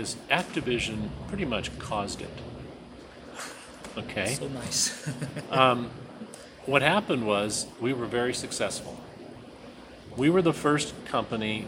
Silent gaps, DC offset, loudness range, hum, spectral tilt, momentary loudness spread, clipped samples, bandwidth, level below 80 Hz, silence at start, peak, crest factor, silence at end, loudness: none; under 0.1%; 8 LU; none; -4 dB/octave; 21 LU; under 0.1%; 16.5 kHz; -52 dBFS; 0 s; -4 dBFS; 26 dB; 0 s; -28 LUFS